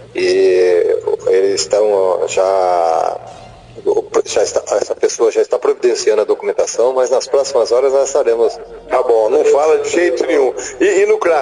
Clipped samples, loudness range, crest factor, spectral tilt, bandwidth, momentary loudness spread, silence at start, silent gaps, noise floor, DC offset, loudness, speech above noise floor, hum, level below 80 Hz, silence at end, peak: under 0.1%; 3 LU; 12 dB; -3 dB/octave; 10.5 kHz; 6 LU; 0 s; none; -36 dBFS; under 0.1%; -14 LUFS; 22 dB; none; -54 dBFS; 0 s; -2 dBFS